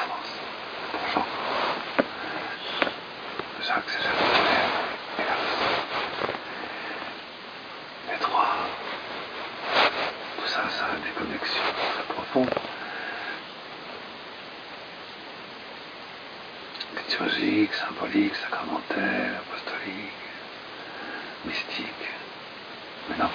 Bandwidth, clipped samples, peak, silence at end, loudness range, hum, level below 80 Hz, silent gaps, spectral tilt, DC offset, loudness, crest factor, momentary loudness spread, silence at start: 5.2 kHz; under 0.1%; -6 dBFS; 0 s; 9 LU; none; -64 dBFS; none; -4.5 dB/octave; under 0.1%; -28 LUFS; 24 dB; 15 LU; 0 s